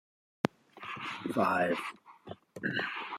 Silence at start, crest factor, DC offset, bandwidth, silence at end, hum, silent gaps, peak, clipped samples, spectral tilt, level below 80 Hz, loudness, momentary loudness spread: 0.45 s; 28 dB; under 0.1%; 16 kHz; 0 s; none; none; -8 dBFS; under 0.1%; -5.5 dB/octave; -78 dBFS; -34 LUFS; 20 LU